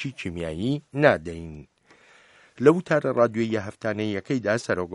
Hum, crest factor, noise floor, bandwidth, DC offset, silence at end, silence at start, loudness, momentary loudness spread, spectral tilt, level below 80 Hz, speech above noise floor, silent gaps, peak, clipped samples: none; 22 dB; -56 dBFS; 11.5 kHz; under 0.1%; 0 s; 0 s; -24 LUFS; 11 LU; -6.5 dB/octave; -54 dBFS; 32 dB; none; -2 dBFS; under 0.1%